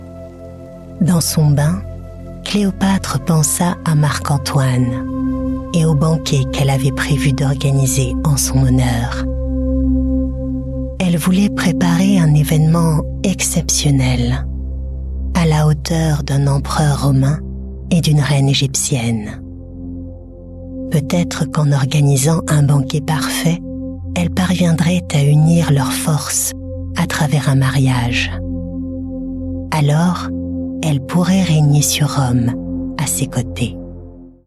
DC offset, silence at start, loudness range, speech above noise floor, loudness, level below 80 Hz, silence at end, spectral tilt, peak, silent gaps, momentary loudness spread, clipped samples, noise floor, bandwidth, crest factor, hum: under 0.1%; 0 s; 3 LU; 21 dB; -16 LUFS; -28 dBFS; 0.15 s; -5.5 dB/octave; -4 dBFS; none; 13 LU; under 0.1%; -35 dBFS; 14 kHz; 12 dB; none